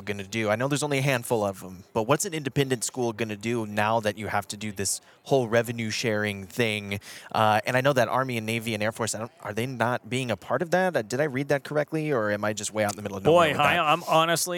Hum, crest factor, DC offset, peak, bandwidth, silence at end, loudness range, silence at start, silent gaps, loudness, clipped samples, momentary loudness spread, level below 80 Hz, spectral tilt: none; 20 dB; under 0.1%; -6 dBFS; 19 kHz; 0 s; 3 LU; 0 s; none; -26 LUFS; under 0.1%; 9 LU; -68 dBFS; -4 dB/octave